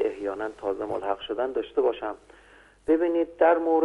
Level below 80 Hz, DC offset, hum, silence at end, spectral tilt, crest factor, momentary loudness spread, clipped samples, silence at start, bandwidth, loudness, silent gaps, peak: -60 dBFS; under 0.1%; none; 0 s; -6 dB/octave; 18 dB; 13 LU; under 0.1%; 0 s; 8.6 kHz; -26 LUFS; none; -8 dBFS